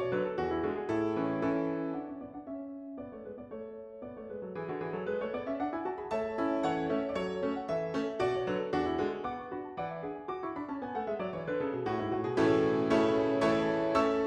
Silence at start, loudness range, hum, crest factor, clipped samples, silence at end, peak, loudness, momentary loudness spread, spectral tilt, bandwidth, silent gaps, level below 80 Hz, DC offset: 0 s; 9 LU; none; 18 dB; under 0.1%; 0 s; -14 dBFS; -33 LUFS; 15 LU; -7 dB/octave; 9.8 kHz; none; -62 dBFS; under 0.1%